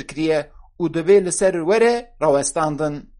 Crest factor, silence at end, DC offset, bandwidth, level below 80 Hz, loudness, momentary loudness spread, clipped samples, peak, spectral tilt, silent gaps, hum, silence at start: 14 dB; 0.15 s; under 0.1%; 11.5 kHz; -48 dBFS; -19 LUFS; 9 LU; under 0.1%; -4 dBFS; -4.5 dB/octave; none; none; 0 s